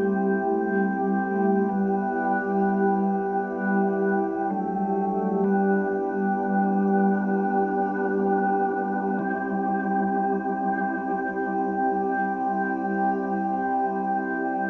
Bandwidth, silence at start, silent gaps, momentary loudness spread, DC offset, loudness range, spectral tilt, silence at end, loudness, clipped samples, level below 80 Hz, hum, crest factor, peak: 2.9 kHz; 0 s; none; 4 LU; under 0.1%; 2 LU; -11 dB/octave; 0 s; -25 LUFS; under 0.1%; -62 dBFS; none; 12 dB; -12 dBFS